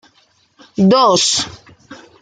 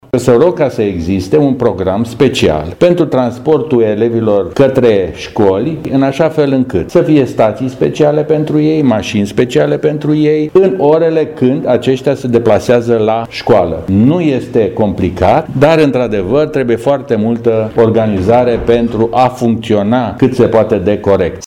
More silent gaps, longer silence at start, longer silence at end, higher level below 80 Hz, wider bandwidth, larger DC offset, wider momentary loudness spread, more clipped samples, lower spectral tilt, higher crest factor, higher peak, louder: neither; first, 0.8 s vs 0.15 s; first, 0.25 s vs 0 s; second, -56 dBFS vs -38 dBFS; second, 9.6 kHz vs 14 kHz; neither; first, 16 LU vs 4 LU; neither; second, -4 dB/octave vs -7.5 dB/octave; first, 16 dB vs 10 dB; about the same, -2 dBFS vs 0 dBFS; about the same, -12 LUFS vs -11 LUFS